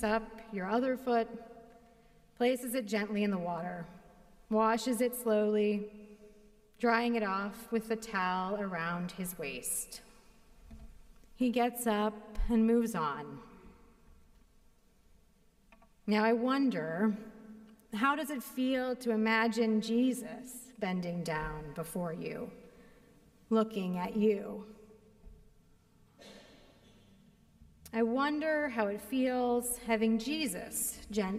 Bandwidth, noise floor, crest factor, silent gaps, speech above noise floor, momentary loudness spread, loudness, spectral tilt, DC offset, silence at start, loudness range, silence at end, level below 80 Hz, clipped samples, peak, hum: 15.5 kHz; -66 dBFS; 20 dB; none; 33 dB; 15 LU; -33 LUFS; -5 dB/octave; under 0.1%; 0 s; 6 LU; 0 s; -54 dBFS; under 0.1%; -14 dBFS; none